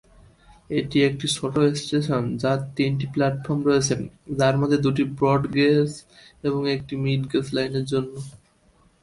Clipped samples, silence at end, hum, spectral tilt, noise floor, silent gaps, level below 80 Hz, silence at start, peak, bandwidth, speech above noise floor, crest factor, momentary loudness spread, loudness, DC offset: under 0.1%; 0.65 s; none; -6 dB/octave; -59 dBFS; none; -52 dBFS; 0.7 s; -6 dBFS; 11.5 kHz; 37 dB; 16 dB; 8 LU; -23 LUFS; under 0.1%